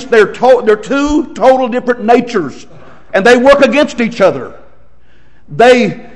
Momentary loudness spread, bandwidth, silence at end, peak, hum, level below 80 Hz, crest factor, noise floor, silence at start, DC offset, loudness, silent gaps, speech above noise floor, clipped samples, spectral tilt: 11 LU; 11 kHz; 0.15 s; 0 dBFS; none; -38 dBFS; 10 dB; -48 dBFS; 0 s; 2%; -9 LUFS; none; 38 dB; 3%; -5 dB/octave